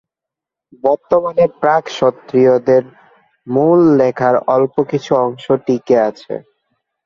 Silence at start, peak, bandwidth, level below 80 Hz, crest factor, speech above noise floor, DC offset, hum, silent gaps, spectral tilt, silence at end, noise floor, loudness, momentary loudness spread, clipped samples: 0.85 s; 0 dBFS; 7.2 kHz; -56 dBFS; 14 dB; 71 dB; under 0.1%; none; none; -7.5 dB/octave; 0.65 s; -85 dBFS; -14 LUFS; 8 LU; under 0.1%